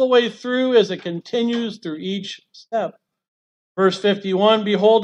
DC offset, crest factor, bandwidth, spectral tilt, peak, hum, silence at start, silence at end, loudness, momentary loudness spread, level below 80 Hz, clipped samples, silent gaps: under 0.1%; 16 dB; 8.8 kHz; -5.5 dB/octave; -4 dBFS; none; 0 s; 0 s; -20 LUFS; 12 LU; -74 dBFS; under 0.1%; 3.28-3.75 s